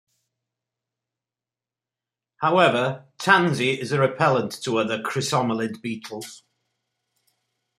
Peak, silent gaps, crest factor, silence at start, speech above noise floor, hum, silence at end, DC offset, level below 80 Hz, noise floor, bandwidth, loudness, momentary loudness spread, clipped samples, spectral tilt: -2 dBFS; none; 22 dB; 2.4 s; over 68 dB; none; 1.4 s; under 0.1%; -70 dBFS; under -90 dBFS; 15.5 kHz; -22 LUFS; 14 LU; under 0.1%; -5 dB/octave